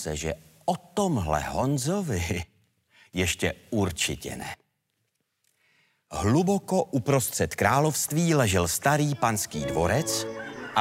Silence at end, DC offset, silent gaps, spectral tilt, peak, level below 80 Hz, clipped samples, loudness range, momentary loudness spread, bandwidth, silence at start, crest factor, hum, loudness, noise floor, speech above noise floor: 0 s; under 0.1%; none; -4.5 dB/octave; -6 dBFS; -50 dBFS; under 0.1%; 7 LU; 12 LU; 16 kHz; 0 s; 20 dB; none; -26 LUFS; -77 dBFS; 51 dB